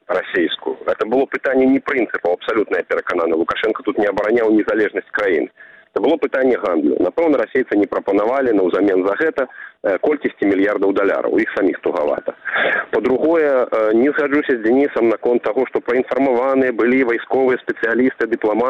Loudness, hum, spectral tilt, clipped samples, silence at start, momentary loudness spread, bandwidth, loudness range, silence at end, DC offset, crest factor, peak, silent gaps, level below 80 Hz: -17 LUFS; none; -6.5 dB/octave; under 0.1%; 0.1 s; 5 LU; 7 kHz; 2 LU; 0 s; under 0.1%; 12 dB; -4 dBFS; none; -56 dBFS